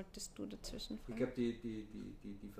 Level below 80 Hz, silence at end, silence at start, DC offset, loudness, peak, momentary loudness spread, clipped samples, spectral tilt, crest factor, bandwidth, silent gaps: -58 dBFS; 0 s; 0 s; under 0.1%; -45 LUFS; -26 dBFS; 12 LU; under 0.1%; -5 dB/octave; 18 dB; 15.5 kHz; none